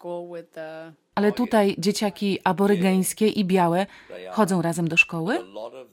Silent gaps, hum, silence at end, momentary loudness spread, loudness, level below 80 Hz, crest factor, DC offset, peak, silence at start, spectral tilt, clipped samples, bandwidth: none; none; 0.1 s; 18 LU; -22 LUFS; -64 dBFS; 20 dB; under 0.1%; -4 dBFS; 0.05 s; -5 dB/octave; under 0.1%; 17 kHz